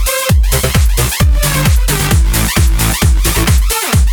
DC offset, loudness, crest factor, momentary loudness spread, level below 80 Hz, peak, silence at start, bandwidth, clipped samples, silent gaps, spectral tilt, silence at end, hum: under 0.1%; -12 LUFS; 10 dB; 1 LU; -12 dBFS; 0 dBFS; 0 s; over 20 kHz; under 0.1%; none; -4 dB/octave; 0 s; none